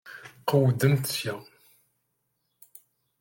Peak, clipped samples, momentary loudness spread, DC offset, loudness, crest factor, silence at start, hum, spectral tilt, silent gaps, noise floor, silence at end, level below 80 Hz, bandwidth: -8 dBFS; under 0.1%; 17 LU; under 0.1%; -25 LUFS; 20 dB; 0.05 s; none; -5.5 dB/octave; none; -77 dBFS; 1.8 s; -68 dBFS; 17 kHz